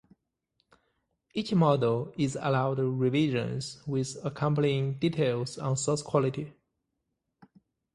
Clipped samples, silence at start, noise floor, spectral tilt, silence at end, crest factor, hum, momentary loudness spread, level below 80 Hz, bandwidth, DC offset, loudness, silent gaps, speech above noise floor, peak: under 0.1%; 1.35 s; -82 dBFS; -6 dB/octave; 1.45 s; 20 dB; none; 9 LU; -64 dBFS; 11.5 kHz; under 0.1%; -29 LUFS; none; 54 dB; -10 dBFS